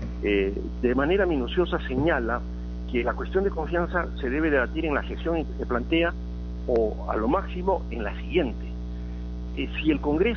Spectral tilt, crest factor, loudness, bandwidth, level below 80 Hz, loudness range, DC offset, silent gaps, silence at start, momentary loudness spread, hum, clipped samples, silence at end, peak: -5 dB/octave; 16 dB; -27 LUFS; 6.4 kHz; -34 dBFS; 2 LU; under 0.1%; none; 0 s; 12 LU; 60 Hz at -35 dBFS; under 0.1%; 0 s; -8 dBFS